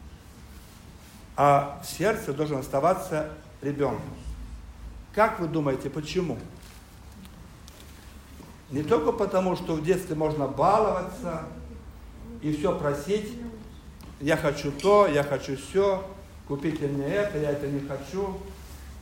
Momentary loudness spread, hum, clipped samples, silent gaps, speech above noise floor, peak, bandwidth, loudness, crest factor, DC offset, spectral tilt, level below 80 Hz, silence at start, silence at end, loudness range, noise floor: 24 LU; none; under 0.1%; none; 21 dB; -8 dBFS; 16 kHz; -27 LUFS; 20 dB; under 0.1%; -6 dB/octave; -46 dBFS; 0 s; 0 s; 5 LU; -47 dBFS